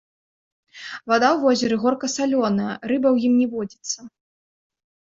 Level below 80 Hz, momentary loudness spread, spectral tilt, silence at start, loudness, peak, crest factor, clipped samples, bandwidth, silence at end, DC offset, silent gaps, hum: -64 dBFS; 13 LU; -4.5 dB/octave; 0.75 s; -21 LUFS; -4 dBFS; 18 dB; under 0.1%; 7.8 kHz; 0.95 s; under 0.1%; none; none